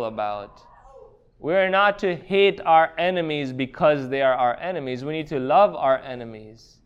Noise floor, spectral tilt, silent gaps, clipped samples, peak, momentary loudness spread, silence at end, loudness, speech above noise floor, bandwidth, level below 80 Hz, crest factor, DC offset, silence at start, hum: -49 dBFS; -6.5 dB/octave; none; under 0.1%; -6 dBFS; 11 LU; 0.3 s; -21 LUFS; 27 dB; 7.6 kHz; -56 dBFS; 18 dB; under 0.1%; 0 s; none